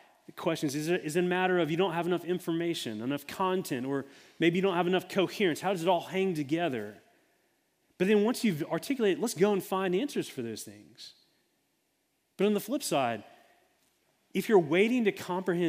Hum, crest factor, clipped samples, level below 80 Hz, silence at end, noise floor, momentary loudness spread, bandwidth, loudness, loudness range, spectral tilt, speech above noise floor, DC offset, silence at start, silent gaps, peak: none; 18 dB; under 0.1%; -78 dBFS; 0 s; -76 dBFS; 12 LU; 16 kHz; -30 LUFS; 5 LU; -5.5 dB/octave; 47 dB; under 0.1%; 0.35 s; none; -12 dBFS